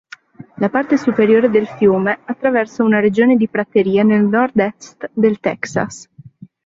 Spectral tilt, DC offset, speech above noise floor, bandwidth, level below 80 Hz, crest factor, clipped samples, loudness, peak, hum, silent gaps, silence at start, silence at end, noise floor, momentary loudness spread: -7 dB/octave; under 0.1%; 26 dB; 7.8 kHz; -56 dBFS; 14 dB; under 0.1%; -15 LUFS; -2 dBFS; none; none; 0.4 s; 0.4 s; -40 dBFS; 9 LU